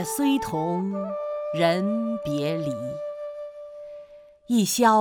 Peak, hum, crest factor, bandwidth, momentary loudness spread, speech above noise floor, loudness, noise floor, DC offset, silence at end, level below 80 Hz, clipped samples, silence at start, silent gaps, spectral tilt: -6 dBFS; none; 18 dB; 19 kHz; 17 LU; 24 dB; -25 LUFS; -47 dBFS; under 0.1%; 0 s; -60 dBFS; under 0.1%; 0 s; none; -5 dB/octave